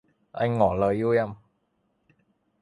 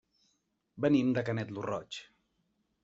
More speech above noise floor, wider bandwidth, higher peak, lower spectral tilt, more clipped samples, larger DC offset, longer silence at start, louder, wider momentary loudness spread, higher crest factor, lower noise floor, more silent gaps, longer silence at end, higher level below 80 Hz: about the same, 49 dB vs 47 dB; first, 11 kHz vs 7.8 kHz; first, -8 dBFS vs -14 dBFS; first, -8.5 dB/octave vs -6 dB/octave; neither; neither; second, 0.35 s vs 0.75 s; first, -25 LUFS vs -32 LUFS; second, 11 LU vs 15 LU; about the same, 20 dB vs 20 dB; second, -72 dBFS vs -78 dBFS; neither; first, 1.25 s vs 0.8 s; first, -52 dBFS vs -70 dBFS